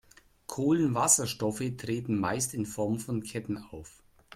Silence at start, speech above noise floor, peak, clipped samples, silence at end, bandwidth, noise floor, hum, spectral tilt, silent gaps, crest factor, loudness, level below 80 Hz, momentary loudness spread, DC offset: 0.5 s; 20 dB; -8 dBFS; under 0.1%; 0 s; 16 kHz; -50 dBFS; none; -4.5 dB/octave; none; 24 dB; -29 LUFS; -62 dBFS; 16 LU; under 0.1%